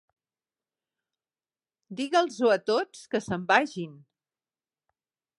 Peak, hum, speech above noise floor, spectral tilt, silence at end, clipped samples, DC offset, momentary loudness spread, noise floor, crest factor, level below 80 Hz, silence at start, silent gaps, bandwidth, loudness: -6 dBFS; none; over 64 dB; -4.5 dB/octave; 1.45 s; under 0.1%; under 0.1%; 14 LU; under -90 dBFS; 24 dB; -72 dBFS; 1.9 s; none; 11.5 kHz; -26 LUFS